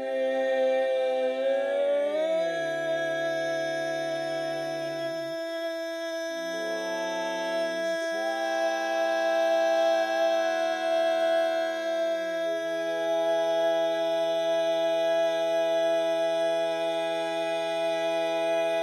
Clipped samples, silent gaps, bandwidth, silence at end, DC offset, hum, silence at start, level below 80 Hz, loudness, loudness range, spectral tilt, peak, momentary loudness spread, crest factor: under 0.1%; none; 13.5 kHz; 0 s; under 0.1%; none; 0 s; -76 dBFS; -27 LUFS; 5 LU; -3 dB/octave; -16 dBFS; 6 LU; 10 dB